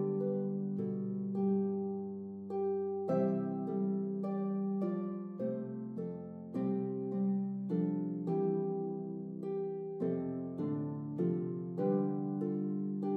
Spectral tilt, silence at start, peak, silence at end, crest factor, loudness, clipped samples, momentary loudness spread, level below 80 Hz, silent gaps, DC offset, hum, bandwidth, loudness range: -12 dB/octave; 0 s; -22 dBFS; 0 s; 14 dB; -36 LUFS; under 0.1%; 8 LU; -84 dBFS; none; under 0.1%; none; 2.8 kHz; 2 LU